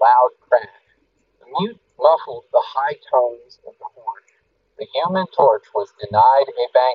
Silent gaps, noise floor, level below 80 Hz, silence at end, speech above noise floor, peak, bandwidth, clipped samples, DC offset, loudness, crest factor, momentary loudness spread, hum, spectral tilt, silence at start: none; -64 dBFS; -66 dBFS; 0 s; 46 dB; 0 dBFS; 5.6 kHz; under 0.1%; under 0.1%; -18 LUFS; 18 dB; 20 LU; none; -3 dB/octave; 0 s